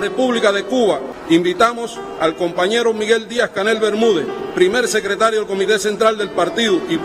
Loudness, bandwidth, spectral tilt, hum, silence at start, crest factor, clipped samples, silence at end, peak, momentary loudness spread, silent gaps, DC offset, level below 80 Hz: -17 LUFS; 15.5 kHz; -3.5 dB/octave; none; 0 s; 14 dB; under 0.1%; 0 s; -2 dBFS; 5 LU; none; under 0.1%; -52 dBFS